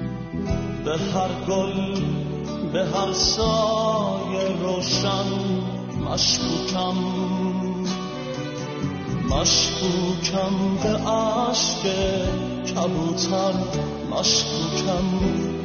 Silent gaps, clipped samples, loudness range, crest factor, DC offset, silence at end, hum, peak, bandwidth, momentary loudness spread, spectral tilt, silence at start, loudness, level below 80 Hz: none; under 0.1%; 3 LU; 16 dB; under 0.1%; 0 s; none; -6 dBFS; 6.8 kHz; 8 LU; -4.5 dB/octave; 0 s; -23 LUFS; -40 dBFS